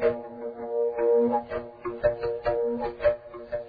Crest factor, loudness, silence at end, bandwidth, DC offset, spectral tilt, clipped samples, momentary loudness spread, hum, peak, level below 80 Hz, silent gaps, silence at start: 16 dB; -28 LUFS; 0 s; 4.9 kHz; under 0.1%; -9.5 dB/octave; under 0.1%; 13 LU; none; -10 dBFS; -50 dBFS; none; 0 s